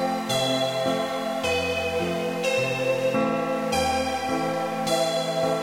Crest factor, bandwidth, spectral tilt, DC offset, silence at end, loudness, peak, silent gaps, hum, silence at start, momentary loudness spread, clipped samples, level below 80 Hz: 12 dB; 16 kHz; -4 dB/octave; under 0.1%; 0 s; -25 LUFS; -12 dBFS; none; none; 0 s; 3 LU; under 0.1%; -52 dBFS